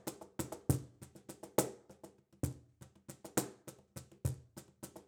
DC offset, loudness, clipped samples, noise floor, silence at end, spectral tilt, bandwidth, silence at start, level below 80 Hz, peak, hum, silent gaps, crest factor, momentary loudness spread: under 0.1%; -40 LUFS; under 0.1%; -61 dBFS; 0.05 s; -5 dB/octave; over 20 kHz; 0.05 s; -58 dBFS; -12 dBFS; none; none; 30 dB; 20 LU